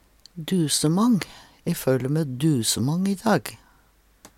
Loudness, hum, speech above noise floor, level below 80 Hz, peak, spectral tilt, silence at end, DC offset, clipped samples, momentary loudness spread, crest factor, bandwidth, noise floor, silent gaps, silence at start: -23 LUFS; none; 37 dB; -58 dBFS; -8 dBFS; -5 dB/octave; 0.1 s; under 0.1%; under 0.1%; 15 LU; 16 dB; 17 kHz; -59 dBFS; none; 0.35 s